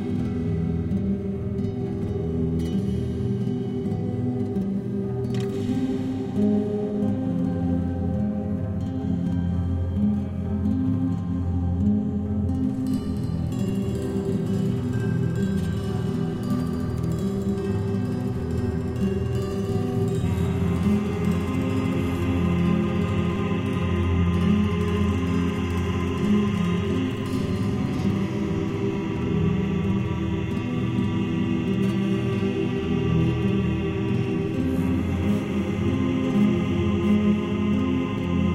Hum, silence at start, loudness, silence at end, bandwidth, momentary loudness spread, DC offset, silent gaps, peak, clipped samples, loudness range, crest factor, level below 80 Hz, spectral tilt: none; 0 s; -25 LUFS; 0 s; 13.5 kHz; 5 LU; under 0.1%; none; -10 dBFS; under 0.1%; 3 LU; 14 dB; -40 dBFS; -8 dB/octave